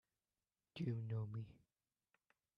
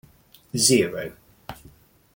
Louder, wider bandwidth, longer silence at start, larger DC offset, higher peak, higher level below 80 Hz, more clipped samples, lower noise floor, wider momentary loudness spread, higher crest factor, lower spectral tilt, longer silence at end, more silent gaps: second, -47 LUFS vs -21 LUFS; second, 5.6 kHz vs 17 kHz; first, 0.75 s vs 0.55 s; neither; second, -32 dBFS vs -2 dBFS; second, -78 dBFS vs -58 dBFS; neither; first, under -90 dBFS vs -54 dBFS; second, 14 LU vs 24 LU; second, 16 dB vs 24 dB; first, -9 dB/octave vs -3 dB/octave; first, 1.05 s vs 0.6 s; neither